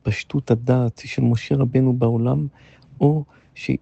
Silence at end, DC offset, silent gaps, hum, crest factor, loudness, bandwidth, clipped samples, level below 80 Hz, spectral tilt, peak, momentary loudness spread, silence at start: 0.05 s; under 0.1%; none; none; 16 dB; -21 LUFS; 8 kHz; under 0.1%; -50 dBFS; -8.5 dB/octave; -6 dBFS; 8 LU; 0.05 s